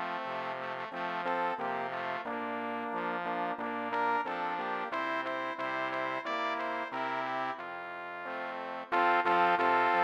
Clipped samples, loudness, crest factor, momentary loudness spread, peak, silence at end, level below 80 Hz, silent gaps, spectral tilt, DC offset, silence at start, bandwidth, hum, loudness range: under 0.1%; -33 LUFS; 18 dB; 11 LU; -14 dBFS; 0 s; -84 dBFS; none; -5 dB/octave; under 0.1%; 0 s; 16 kHz; none; 3 LU